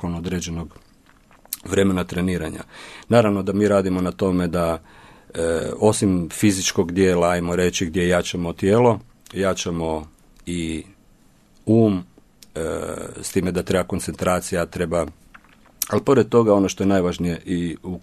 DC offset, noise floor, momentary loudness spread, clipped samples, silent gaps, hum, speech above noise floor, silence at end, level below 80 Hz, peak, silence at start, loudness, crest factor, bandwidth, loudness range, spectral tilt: under 0.1%; -54 dBFS; 13 LU; under 0.1%; none; none; 33 dB; 0.05 s; -46 dBFS; 0 dBFS; 0 s; -21 LUFS; 20 dB; 13.5 kHz; 5 LU; -5.5 dB/octave